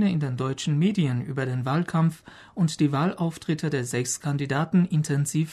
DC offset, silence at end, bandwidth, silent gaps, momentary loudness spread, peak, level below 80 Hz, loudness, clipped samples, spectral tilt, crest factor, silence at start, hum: under 0.1%; 0 s; 13.5 kHz; none; 5 LU; -10 dBFS; -62 dBFS; -25 LUFS; under 0.1%; -6 dB/octave; 14 dB; 0 s; none